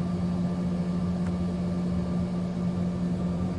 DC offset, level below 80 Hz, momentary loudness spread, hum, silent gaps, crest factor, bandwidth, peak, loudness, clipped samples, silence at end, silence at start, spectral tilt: under 0.1%; -46 dBFS; 1 LU; none; none; 10 dB; 8.8 kHz; -18 dBFS; -29 LUFS; under 0.1%; 0 s; 0 s; -8.5 dB/octave